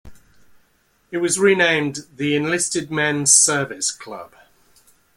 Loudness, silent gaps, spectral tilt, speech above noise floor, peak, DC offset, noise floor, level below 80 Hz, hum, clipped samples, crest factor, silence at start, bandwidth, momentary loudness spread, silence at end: -17 LUFS; none; -2.5 dB/octave; 42 dB; 0 dBFS; under 0.1%; -62 dBFS; -58 dBFS; none; under 0.1%; 22 dB; 0.05 s; 16 kHz; 17 LU; 0.9 s